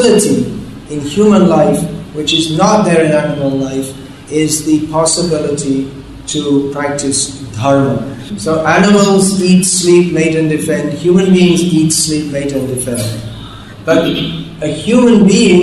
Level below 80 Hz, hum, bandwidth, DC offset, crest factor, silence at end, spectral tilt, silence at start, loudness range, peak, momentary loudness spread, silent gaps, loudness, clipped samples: -40 dBFS; none; 13 kHz; under 0.1%; 12 dB; 0 s; -5 dB/octave; 0 s; 5 LU; 0 dBFS; 12 LU; none; -11 LUFS; under 0.1%